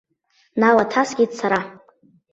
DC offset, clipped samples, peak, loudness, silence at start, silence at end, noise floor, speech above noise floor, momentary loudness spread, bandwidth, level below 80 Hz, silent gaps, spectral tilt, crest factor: under 0.1%; under 0.1%; -2 dBFS; -19 LUFS; 0.55 s; 0.6 s; -63 dBFS; 45 dB; 11 LU; 8 kHz; -62 dBFS; none; -5 dB/octave; 18 dB